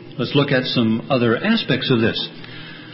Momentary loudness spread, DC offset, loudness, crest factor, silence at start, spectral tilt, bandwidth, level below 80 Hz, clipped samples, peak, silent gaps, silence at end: 14 LU; under 0.1%; -19 LUFS; 16 dB; 0 s; -10 dB/octave; 5.8 kHz; -52 dBFS; under 0.1%; -4 dBFS; none; 0 s